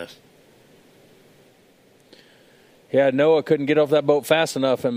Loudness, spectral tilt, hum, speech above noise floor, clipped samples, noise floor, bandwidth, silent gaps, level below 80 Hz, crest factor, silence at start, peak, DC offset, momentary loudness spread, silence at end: -19 LUFS; -5.5 dB/octave; none; 37 dB; under 0.1%; -55 dBFS; 16 kHz; none; -72 dBFS; 20 dB; 0 s; -2 dBFS; under 0.1%; 4 LU; 0 s